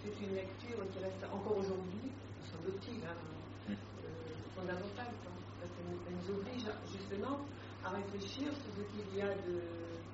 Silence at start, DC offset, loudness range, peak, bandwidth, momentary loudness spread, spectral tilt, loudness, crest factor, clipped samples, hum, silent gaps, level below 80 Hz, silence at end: 0 s; under 0.1%; 3 LU; -26 dBFS; 7.6 kHz; 9 LU; -5.5 dB/octave; -44 LUFS; 18 dB; under 0.1%; none; none; -66 dBFS; 0 s